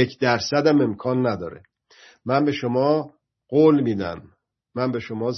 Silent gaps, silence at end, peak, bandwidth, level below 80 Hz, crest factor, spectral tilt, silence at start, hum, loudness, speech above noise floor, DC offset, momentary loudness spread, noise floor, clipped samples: none; 0 s; -4 dBFS; 6.4 kHz; -64 dBFS; 18 dB; -6.5 dB/octave; 0 s; none; -21 LUFS; 32 dB; under 0.1%; 17 LU; -53 dBFS; under 0.1%